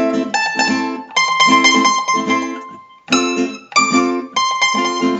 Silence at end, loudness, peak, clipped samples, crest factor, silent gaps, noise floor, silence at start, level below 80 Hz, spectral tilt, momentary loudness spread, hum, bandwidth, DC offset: 0 s; -14 LUFS; 0 dBFS; under 0.1%; 16 dB; none; -36 dBFS; 0 s; -68 dBFS; -2 dB/octave; 9 LU; none; 8.2 kHz; under 0.1%